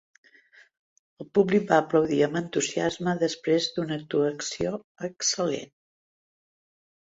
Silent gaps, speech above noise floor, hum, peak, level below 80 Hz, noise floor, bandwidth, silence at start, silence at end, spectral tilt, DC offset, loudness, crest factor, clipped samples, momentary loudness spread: 4.84-4.95 s; 32 dB; none; -6 dBFS; -64 dBFS; -57 dBFS; 8 kHz; 1.2 s; 1.45 s; -4 dB/octave; under 0.1%; -26 LUFS; 22 dB; under 0.1%; 9 LU